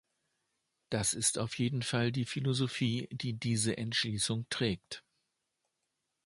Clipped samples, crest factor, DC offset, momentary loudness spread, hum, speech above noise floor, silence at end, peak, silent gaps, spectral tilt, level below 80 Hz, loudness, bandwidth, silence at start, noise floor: under 0.1%; 20 dB; under 0.1%; 7 LU; none; 51 dB; 1.25 s; -14 dBFS; none; -4 dB/octave; -64 dBFS; -33 LUFS; 11.5 kHz; 0.9 s; -84 dBFS